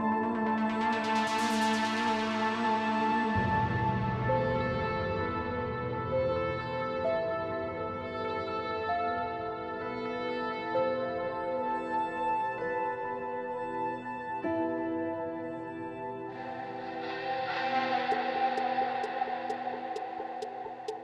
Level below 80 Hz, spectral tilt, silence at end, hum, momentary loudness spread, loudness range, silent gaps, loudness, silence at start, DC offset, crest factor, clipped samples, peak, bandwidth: -56 dBFS; -6 dB/octave; 0 s; none; 9 LU; 6 LU; none; -32 LUFS; 0 s; under 0.1%; 16 dB; under 0.1%; -16 dBFS; 13 kHz